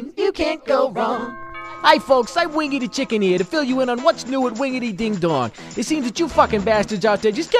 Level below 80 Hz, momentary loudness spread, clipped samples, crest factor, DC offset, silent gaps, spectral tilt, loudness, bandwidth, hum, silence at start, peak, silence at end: -46 dBFS; 7 LU; under 0.1%; 20 dB; under 0.1%; none; -4.5 dB/octave; -19 LUFS; 15 kHz; none; 0 s; 0 dBFS; 0 s